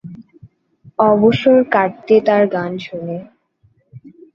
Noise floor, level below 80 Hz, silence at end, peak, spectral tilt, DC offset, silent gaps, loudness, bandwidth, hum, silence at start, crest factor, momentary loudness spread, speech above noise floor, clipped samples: -58 dBFS; -56 dBFS; 0.25 s; 0 dBFS; -8 dB/octave; under 0.1%; none; -15 LUFS; 7 kHz; none; 0.05 s; 16 dB; 16 LU; 44 dB; under 0.1%